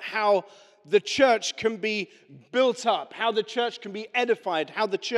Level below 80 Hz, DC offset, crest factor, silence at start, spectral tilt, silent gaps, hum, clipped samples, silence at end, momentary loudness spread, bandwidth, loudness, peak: -72 dBFS; under 0.1%; 20 dB; 0 s; -3 dB/octave; none; none; under 0.1%; 0 s; 8 LU; 12 kHz; -25 LUFS; -6 dBFS